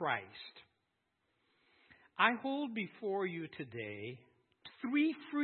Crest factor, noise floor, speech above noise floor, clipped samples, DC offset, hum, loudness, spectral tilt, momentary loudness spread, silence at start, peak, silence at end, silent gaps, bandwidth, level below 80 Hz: 26 dB; -83 dBFS; 46 dB; under 0.1%; under 0.1%; none; -37 LUFS; -3 dB/octave; 20 LU; 0 s; -12 dBFS; 0 s; none; 4.3 kHz; -88 dBFS